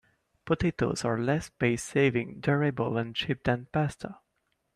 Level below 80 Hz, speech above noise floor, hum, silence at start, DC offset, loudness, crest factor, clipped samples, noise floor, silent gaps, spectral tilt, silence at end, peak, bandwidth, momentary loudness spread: -54 dBFS; 49 dB; none; 0.45 s; under 0.1%; -29 LUFS; 18 dB; under 0.1%; -77 dBFS; none; -6 dB/octave; 0.6 s; -12 dBFS; 13.5 kHz; 5 LU